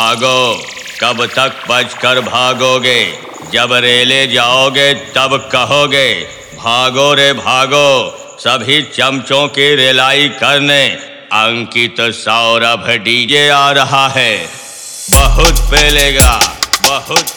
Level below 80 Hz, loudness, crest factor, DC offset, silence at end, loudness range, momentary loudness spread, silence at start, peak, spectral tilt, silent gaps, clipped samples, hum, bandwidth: -22 dBFS; -9 LUFS; 10 dB; 0.2%; 0 s; 1 LU; 8 LU; 0 s; 0 dBFS; -2.5 dB/octave; none; 0.7%; none; over 20 kHz